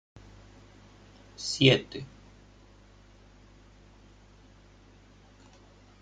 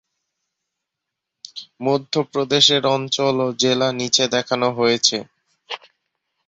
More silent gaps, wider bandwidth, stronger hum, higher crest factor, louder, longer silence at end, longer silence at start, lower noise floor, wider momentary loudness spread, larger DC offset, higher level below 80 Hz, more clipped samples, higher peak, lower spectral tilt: neither; first, 9.4 kHz vs 8.2 kHz; first, 50 Hz at -55 dBFS vs none; first, 28 dB vs 20 dB; second, -26 LUFS vs -18 LUFS; first, 3.95 s vs 0.7 s; second, 1.4 s vs 1.55 s; second, -56 dBFS vs -82 dBFS; first, 31 LU vs 19 LU; neither; first, -58 dBFS vs -64 dBFS; neither; second, -6 dBFS vs -2 dBFS; first, -4.5 dB/octave vs -3 dB/octave